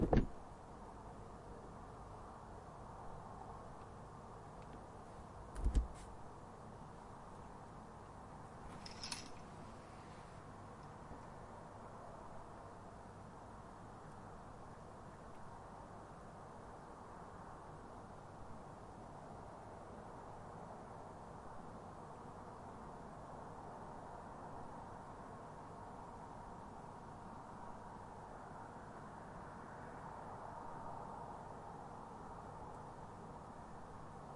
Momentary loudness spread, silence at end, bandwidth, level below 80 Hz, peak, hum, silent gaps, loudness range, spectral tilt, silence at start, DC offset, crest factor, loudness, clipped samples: 5 LU; 0 s; 11.5 kHz; -54 dBFS; -20 dBFS; none; none; 6 LU; -6 dB/octave; 0 s; under 0.1%; 30 dB; -52 LUFS; under 0.1%